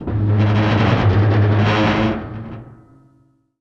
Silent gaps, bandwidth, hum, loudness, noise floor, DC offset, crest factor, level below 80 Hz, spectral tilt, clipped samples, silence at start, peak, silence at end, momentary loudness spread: none; 6.6 kHz; none; -16 LUFS; -57 dBFS; under 0.1%; 12 dB; -38 dBFS; -8 dB/octave; under 0.1%; 0 s; -4 dBFS; 0.85 s; 16 LU